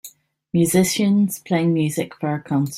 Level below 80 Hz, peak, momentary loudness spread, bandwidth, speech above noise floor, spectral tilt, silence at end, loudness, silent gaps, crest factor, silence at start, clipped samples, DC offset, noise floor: -58 dBFS; -4 dBFS; 8 LU; 16 kHz; 26 dB; -5.5 dB/octave; 0 s; -20 LUFS; none; 16 dB; 0.05 s; under 0.1%; under 0.1%; -45 dBFS